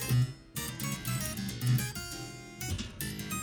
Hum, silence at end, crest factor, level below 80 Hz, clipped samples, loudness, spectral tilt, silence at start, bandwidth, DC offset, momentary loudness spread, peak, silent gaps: none; 0 s; 16 dB; -50 dBFS; under 0.1%; -35 LUFS; -4.5 dB/octave; 0 s; over 20 kHz; under 0.1%; 10 LU; -18 dBFS; none